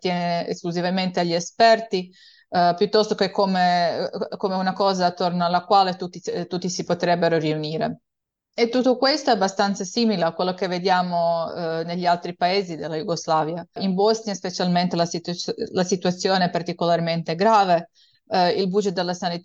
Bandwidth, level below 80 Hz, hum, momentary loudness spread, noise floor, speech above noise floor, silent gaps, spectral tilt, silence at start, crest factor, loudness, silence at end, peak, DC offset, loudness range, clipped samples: 8 kHz; -68 dBFS; none; 9 LU; -74 dBFS; 52 dB; none; -5 dB/octave; 0.05 s; 18 dB; -22 LUFS; 0.05 s; -4 dBFS; under 0.1%; 3 LU; under 0.1%